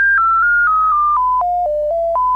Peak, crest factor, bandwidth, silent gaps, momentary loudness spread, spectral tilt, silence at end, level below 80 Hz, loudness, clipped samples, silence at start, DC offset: -8 dBFS; 6 dB; 6.8 kHz; none; 6 LU; -5 dB/octave; 0 s; -42 dBFS; -14 LUFS; under 0.1%; 0 s; under 0.1%